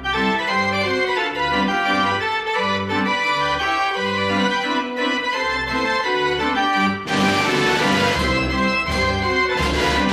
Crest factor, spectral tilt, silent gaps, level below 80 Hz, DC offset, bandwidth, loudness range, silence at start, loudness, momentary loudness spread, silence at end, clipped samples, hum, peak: 14 dB; -4 dB/octave; none; -38 dBFS; under 0.1%; 15 kHz; 2 LU; 0 s; -19 LUFS; 3 LU; 0 s; under 0.1%; none; -6 dBFS